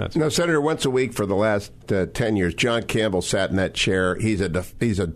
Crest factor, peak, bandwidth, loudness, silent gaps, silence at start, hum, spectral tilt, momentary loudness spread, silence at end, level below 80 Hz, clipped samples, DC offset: 14 dB; -8 dBFS; 13.5 kHz; -22 LUFS; none; 0 s; none; -5 dB/octave; 4 LU; 0 s; -44 dBFS; under 0.1%; under 0.1%